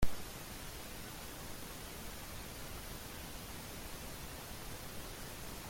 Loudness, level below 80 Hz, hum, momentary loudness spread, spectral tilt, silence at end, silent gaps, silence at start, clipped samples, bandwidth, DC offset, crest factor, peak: -47 LUFS; -50 dBFS; none; 0 LU; -3.5 dB/octave; 0 s; none; 0 s; under 0.1%; 16.5 kHz; under 0.1%; 22 dB; -18 dBFS